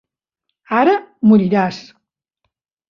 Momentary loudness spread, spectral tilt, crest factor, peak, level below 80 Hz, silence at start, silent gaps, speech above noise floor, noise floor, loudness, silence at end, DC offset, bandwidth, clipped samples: 9 LU; -8 dB/octave; 16 dB; -2 dBFS; -62 dBFS; 0.7 s; none; 63 dB; -77 dBFS; -15 LUFS; 1.1 s; under 0.1%; 6.8 kHz; under 0.1%